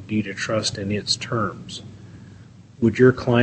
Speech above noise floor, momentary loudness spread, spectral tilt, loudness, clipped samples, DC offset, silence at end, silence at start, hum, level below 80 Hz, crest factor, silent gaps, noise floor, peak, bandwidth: 24 dB; 20 LU; -5 dB/octave; -21 LUFS; under 0.1%; under 0.1%; 0 s; 0 s; none; -52 dBFS; 20 dB; none; -45 dBFS; -2 dBFS; 8.8 kHz